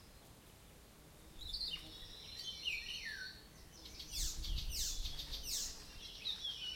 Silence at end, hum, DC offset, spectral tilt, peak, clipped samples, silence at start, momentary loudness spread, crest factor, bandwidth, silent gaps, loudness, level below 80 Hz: 0 s; none; under 0.1%; -0.5 dB/octave; -26 dBFS; under 0.1%; 0 s; 20 LU; 18 dB; 16.5 kHz; none; -43 LUFS; -50 dBFS